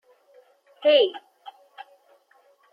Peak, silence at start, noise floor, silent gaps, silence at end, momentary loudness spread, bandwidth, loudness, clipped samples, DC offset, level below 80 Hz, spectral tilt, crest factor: -8 dBFS; 0.8 s; -61 dBFS; none; 0.9 s; 28 LU; 5.2 kHz; -21 LUFS; under 0.1%; under 0.1%; under -90 dBFS; -3 dB/octave; 20 dB